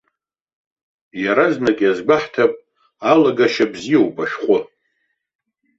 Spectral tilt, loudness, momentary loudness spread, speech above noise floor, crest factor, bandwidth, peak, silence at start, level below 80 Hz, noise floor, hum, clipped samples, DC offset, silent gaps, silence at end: -5.5 dB/octave; -17 LUFS; 9 LU; 57 dB; 18 dB; 7.8 kHz; -2 dBFS; 1.15 s; -62 dBFS; -73 dBFS; none; under 0.1%; under 0.1%; none; 1.15 s